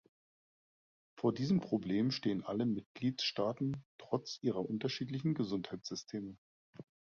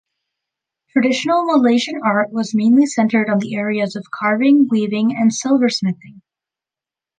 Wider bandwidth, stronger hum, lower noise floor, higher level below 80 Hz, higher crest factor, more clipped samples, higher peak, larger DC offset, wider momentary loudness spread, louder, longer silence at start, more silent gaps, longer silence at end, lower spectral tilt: second, 7.2 kHz vs 9.6 kHz; neither; about the same, under -90 dBFS vs -89 dBFS; about the same, -72 dBFS vs -68 dBFS; first, 20 dB vs 14 dB; neither; second, -18 dBFS vs -2 dBFS; neither; first, 11 LU vs 8 LU; second, -37 LUFS vs -16 LUFS; first, 1.15 s vs 0.95 s; first, 2.86-2.95 s, 3.85-3.99 s, 6.38-6.73 s vs none; second, 0.35 s vs 1 s; about the same, -5.5 dB/octave vs -5 dB/octave